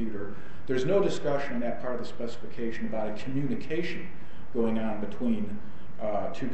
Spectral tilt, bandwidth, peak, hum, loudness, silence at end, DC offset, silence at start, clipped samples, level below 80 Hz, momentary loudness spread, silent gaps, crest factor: -7 dB/octave; 8.4 kHz; -12 dBFS; none; -32 LUFS; 0 s; 5%; 0 s; under 0.1%; -54 dBFS; 13 LU; none; 18 dB